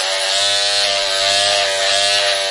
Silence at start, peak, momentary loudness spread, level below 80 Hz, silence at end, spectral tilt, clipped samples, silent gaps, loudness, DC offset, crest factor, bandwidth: 0 s; -2 dBFS; 2 LU; -56 dBFS; 0 s; 1.5 dB/octave; under 0.1%; none; -13 LUFS; under 0.1%; 14 dB; 11.5 kHz